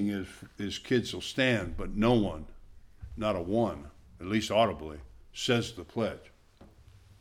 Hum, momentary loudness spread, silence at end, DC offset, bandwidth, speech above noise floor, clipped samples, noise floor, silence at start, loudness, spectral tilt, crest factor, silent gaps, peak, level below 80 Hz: none; 18 LU; 0.55 s; under 0.1%; 15.5 kHz; 26 dB; under 0.1%; -57 dBFS; 0 s; -30 LUFS; -5.5 dB/octave; 20 dB; none; -12 dBFS; -48 dBFS